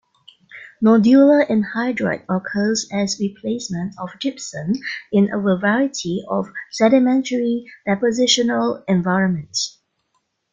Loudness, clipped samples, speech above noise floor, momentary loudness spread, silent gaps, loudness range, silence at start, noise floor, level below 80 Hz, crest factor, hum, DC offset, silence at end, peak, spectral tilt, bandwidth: -19 LUFS; under 0.1%; 52 dB; 12 LU; none; 5 LU; 0.55 s; -70 dBFS; -60 dBFS; 18 dB; none; under 0.1%; 0.85 s; -2 dBFS; -5 dB/octave; 9.4 kHz